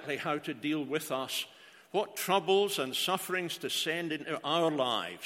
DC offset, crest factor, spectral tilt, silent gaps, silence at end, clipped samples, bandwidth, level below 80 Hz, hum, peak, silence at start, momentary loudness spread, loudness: under 0.1%; 20 dB; -3 dB/octave; none; 0 s; under 0.1%; 16.5 kHz; -82 dBFS; none; -14 dBFS; 0 s; 7 LU; -32 LUFS